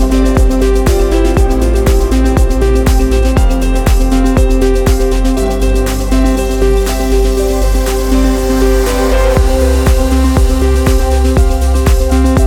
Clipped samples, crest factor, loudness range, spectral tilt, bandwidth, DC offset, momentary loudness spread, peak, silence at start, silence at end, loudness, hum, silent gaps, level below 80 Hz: under 0.1%; 8 dB; 1 LU; -6 dB/octave; 17 kHz; under 0.1%; 2 LU; 0 dBFS; 0 s; 0 s; -12 LUFS; none; none; -10 dBFS